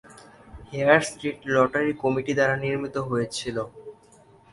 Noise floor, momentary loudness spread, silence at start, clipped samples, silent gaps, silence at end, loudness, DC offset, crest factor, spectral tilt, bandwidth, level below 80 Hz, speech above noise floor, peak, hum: -54 dBFS; 13 LU; 0.1 s; under 0.1%; none; 0.6 s; -24 LUFS; under 0.1%; 22 dB; -5 dB/octave; 11.5 kHz; -56 dBFS; 30 dB; -2 dBFS; none